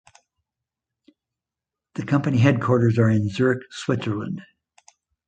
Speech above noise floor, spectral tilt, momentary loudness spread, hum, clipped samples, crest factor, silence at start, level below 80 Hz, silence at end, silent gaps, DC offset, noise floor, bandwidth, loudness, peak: 67 dB; -7.5 dB/octave; 15 LU; none; under 0.1%; 18 dB; 1.95 s; -54 dBFS; 0.85 s; none; under 0.1%; -88 dBFS; 9 kHz; -21 LUFS; -4 dBFS